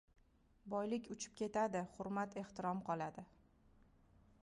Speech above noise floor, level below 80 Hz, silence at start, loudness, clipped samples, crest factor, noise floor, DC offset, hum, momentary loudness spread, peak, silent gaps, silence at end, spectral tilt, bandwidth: 27 dB; -74 dBFS; 0.65 s; -43 LUFS; under 0.1%; 18 dB; -70 dBFS; under 0.1%; none; 10 LU; -28 dBFS; none; 1.2 s; -5.5 dB/octave; 11 kHz